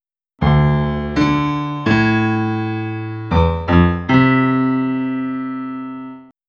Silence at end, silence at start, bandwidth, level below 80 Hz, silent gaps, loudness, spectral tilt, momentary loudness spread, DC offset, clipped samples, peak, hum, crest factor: 0.25 s; 0.4 s; 7 kHz; -32 dBFS; none; -17 LUFS; -8 dB/octave; 12 LU; under 0.1%; under 0.1%; 0 dBFS; none; 16 dB